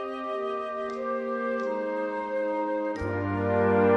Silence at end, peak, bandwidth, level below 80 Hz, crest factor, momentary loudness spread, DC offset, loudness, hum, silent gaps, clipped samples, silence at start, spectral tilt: 0 s; -10 dBFS; 8.2 kHz; -56 dBFS; 16 dB; 7 LU; under 0.1%; -29 LUFS; none; none; under 0.1%; 0 s; -8.5 dB/octave